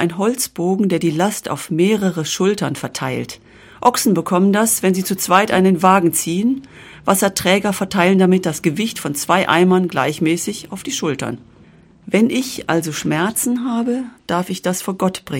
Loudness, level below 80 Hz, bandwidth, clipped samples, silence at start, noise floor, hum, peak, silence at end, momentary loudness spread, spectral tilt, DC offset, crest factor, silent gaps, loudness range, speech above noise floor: -17 LUFS; -54 dBFS; 17 kHz; under 0.1%; 0 s; -47 dBFS; none; 0 dBFS; 0 s; 10 LU; -4.5 dB/octave; under 0.1%; 18 dB; none; 5 LU; 30 dB